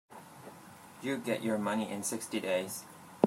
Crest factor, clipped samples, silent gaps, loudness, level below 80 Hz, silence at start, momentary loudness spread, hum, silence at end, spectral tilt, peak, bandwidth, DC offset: 28 dB; under 0.1%; none; -35 LUFS; -82 dBFS; 0.1 s; 19 LU; none; 0 s; -4.5 dB/octave; -8 dBFS; 16 kHz; under 0.1%